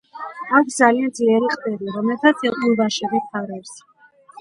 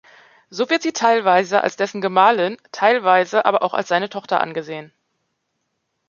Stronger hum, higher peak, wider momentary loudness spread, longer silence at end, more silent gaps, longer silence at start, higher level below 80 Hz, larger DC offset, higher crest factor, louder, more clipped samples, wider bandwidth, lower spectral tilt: neither; about the same, 0 dBFS vs 0 dBFS; first, 16 LU vs 10 LU; second, 0.6 s vs 1.2 s; neither; second, 0.15 s vs 0.5 s; about the same, -68 dBFS vs -72 dBFS; neither; about the same, 20 dB vs 18 dB; about the same, -19 LUFS vs -18 LUFS; neither; first, 11.5 kHz vs 7.4 kHz; about the same, -4 dB/octave vs -4 dB/octave